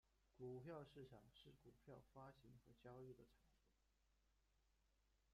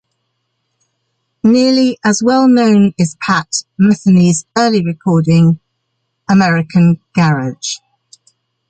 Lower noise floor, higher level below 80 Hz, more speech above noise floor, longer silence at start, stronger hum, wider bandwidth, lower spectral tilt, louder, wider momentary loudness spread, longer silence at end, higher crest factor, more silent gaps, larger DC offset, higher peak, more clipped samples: first, -84 dBFS vs -69 dBFS; second, -82 dBFS vs -52 dBFS; second, 21 dB vs 58 dB; second, 0.05 s vs 1.45 s; neither; about the same, 9.4 kHz vs 9.2 kHz; about the same, -7 dB/octave vs -6 dB/octave; second, -62 LUFS vs -12 LUFS; about the same, 11 LU vs 10 LU; second, 0 s vs 0.95 s; first, 18 dB vs 12 dB; neither; neither; second, -46 dBFS vs -2 dBFS; neither